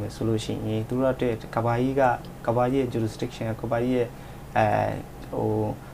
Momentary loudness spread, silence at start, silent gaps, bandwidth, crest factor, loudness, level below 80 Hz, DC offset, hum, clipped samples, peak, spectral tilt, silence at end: 8 LU; 0 s; none; 15.5 kHz; 18 dB; -26 LUFS; -46 dBFS; under 0.1%; none; under 0.1%; -8 dBFS; -7 dB/octave; 0 s